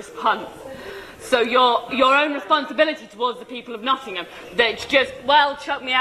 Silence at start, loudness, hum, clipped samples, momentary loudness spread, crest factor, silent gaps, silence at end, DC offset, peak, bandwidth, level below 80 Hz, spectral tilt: 0 s; -20 LUFS; none; under 0.1%; 17 LU; 18 dB; none; 0 s; under 0.1%; -4 dBFS; 14 kHz; -56 dBFS; -3 dB/octave